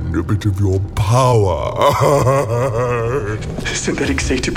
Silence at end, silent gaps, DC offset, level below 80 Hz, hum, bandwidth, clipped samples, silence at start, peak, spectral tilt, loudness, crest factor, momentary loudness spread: 0 s; none; under 0.1%; -30 dBFS; none; 16 kHz; under 0.1%; 0 s; -2 dBFS; -5.5 dB/octave; -16 LUFS; 14 dB; 7 LU